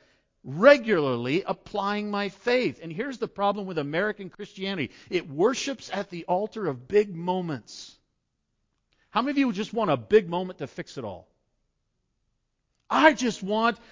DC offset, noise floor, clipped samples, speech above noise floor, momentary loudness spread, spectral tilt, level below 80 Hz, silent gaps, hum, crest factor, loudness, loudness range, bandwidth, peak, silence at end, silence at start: under 0.1%; -77 dBFS; under 0.1%; 52 dB; 16 LU; -5 dB/octave; -64 dBFS; none; none; 22 dB; -26 LUFS; 5 LU; 7.6 kHz; -4 dBFS; 0.15 s; 0.45 s